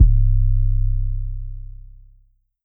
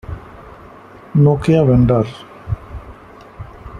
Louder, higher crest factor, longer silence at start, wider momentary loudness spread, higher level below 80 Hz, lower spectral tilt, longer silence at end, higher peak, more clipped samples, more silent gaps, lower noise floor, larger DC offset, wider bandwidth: second, -22 LUFS vs -15 LUFS; about the same, 16 dB vs 16 dB; about the same, 0 s vs 0.1 s; second, 19 LU vs 23 LU; first, -18 dBFS vs -36 dBFS; first, -15.5 dB/octave vs -9.5 dB/octave; first, 0.8 s vs 0 s; about the same, -2 dBFS vs 0 dBFS; neither; neither; first, -56 dBFS vs -39 dBFS; neither; second, 0.3 kHz vs 10 kHz